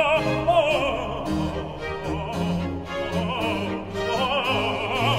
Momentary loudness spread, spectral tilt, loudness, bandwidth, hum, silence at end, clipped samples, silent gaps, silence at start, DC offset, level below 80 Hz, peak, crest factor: 9 LU; -5.5 dB/octave; -25 LUFS; 16 kHz; none; 0 s; under 0.1%; none; 0 s; under 0.1%; -40 dBFS; -8 dBFS; 16 dB